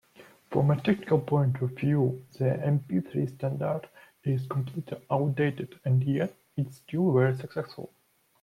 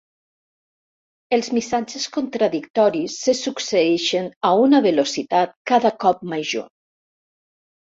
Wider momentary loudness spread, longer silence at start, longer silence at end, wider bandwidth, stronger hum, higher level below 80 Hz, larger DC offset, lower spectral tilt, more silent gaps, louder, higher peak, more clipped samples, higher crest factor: about the same, 11 LU vs 9 LU; second, 0.2 s vs 1.3 s; second, 0.55 s vs 1.25 s; first, 11 kHz vs 7.8 kHz; neither; about the same, -66 dBFS vs -66 dBFS; neither; first, -9 dB/octave vs -4 dB/octave; second, none vs 2.70-2.74 s, 4.36-4.41 s, 5.56-5.65 s; second, -29 LUFS vs -20 LUFS; second, -12 dBFS vs -4 dBFS; neither; about the same, 18 dB vs 18 dB